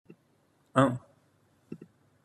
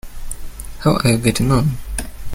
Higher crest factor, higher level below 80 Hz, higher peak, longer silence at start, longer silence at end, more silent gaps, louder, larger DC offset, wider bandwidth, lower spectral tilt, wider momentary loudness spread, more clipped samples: first, 26 dB vs 16 dB; second, -68 dBFS vs -30 dBFS; second, -8 dBFS vs -2 dBFS; first, 0.75 s vs 0.05 s; first, 0.5 s vs 0 s; neither; second, -28 LUFS vs -18 LUFS; neither; second, 12 kHz vs 17 kHz; first, -7 dB/octave vs -5.5 dB/octave; first, 22 LU vs 18 LU; neither